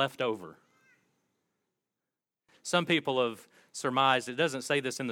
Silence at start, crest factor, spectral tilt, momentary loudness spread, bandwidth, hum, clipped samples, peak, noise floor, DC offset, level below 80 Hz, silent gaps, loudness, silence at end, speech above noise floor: 0 s; 22 dB; -3.5 dB/octave; 17 LU; 17 kHz; none; under 0.1%; -10 dBFS; -90 dBFS; under 0.1%; -82 dBFS; none; -29 LUFS; 0 s; 60 dB